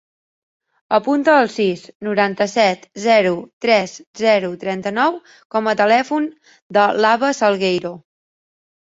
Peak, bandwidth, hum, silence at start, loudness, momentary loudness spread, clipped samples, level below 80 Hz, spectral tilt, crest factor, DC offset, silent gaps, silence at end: -2 dBFS; 8 kHz; none; 0.9 s; -17 LUFS; 9 LU; under 0.1%; -66 dBFS; -4.5 dB/octave; 16 dB; under 0.1%; 1.95-2.00 s, 3.53-3.61 s, 4.07-4.13 s, 5.45-5.50 s, 6.62-6.70 s; 1 s